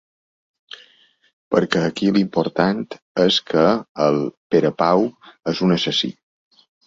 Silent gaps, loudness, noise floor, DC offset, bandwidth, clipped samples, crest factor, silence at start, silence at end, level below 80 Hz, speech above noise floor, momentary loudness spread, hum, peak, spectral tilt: 3.02-3.15 s, 3.89-3.95 s, 4.37-4.50 s; -19 LUFS; -56 dBFS; under 0.1%; 7.8 kHz; under 0.1%; 18 dB; 1.5 s; 0.75 s; -58 dBFS; 37 dB; 10 LU; none; -2 dBFS; -6 dB/octave